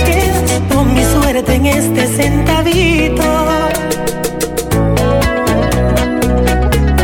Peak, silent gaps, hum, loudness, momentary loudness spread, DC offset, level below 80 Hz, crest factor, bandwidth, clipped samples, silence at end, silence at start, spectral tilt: 0 dBFS; none; none; -12 LUFS; 4 LU; under 0.1%; -20 dBFS; 10 dB; over 20 kHz; under 0.1%; 0 s; 0 s; -5 dB/octave